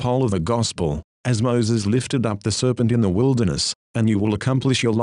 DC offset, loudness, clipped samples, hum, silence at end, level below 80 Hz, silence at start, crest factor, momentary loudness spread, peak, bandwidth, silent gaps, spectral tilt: under 0.1%; -21 LUFS; under 0.1%; none; 0 s; -44 dBFS; 0 s; 14 dB; 4 LU; -6 dBFS; 11 kHz; 1.04-1.24 s, 3.75-3.94 s; -5.5 dB/octave